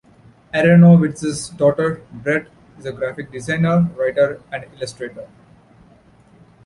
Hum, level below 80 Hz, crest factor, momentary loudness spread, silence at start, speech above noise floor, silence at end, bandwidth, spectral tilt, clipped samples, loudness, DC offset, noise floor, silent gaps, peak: none; -52 dBFS; 16 dB; 21 LU; 0.55 s; 33 dB; 1.4 s; 11.5 kHz; -7.5 dB/octave; under 0.1%; -17 LUFS; under 0.1%; -50 dBFS; none; -2 dBFS